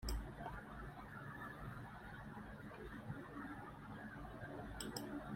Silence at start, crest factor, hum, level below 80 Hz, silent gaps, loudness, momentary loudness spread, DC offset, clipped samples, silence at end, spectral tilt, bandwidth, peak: 0 s; 22 dB; none; -56 dBFS; none; -51 LUFS; 6 LU; under 0.1%; under 0.1%; 0 s; -5 dB/octave; 16 kHz; -28 dBFS